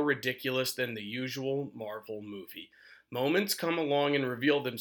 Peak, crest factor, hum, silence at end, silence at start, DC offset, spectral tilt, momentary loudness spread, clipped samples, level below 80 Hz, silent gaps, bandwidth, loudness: -14 dBFS; 18 dB; none; 0 s; 0 s; under 0.1%; -4.5 dB/octave; 14 LU; under 0.1%; -80 dBFS; none; over 20 kHz; -31 LUFS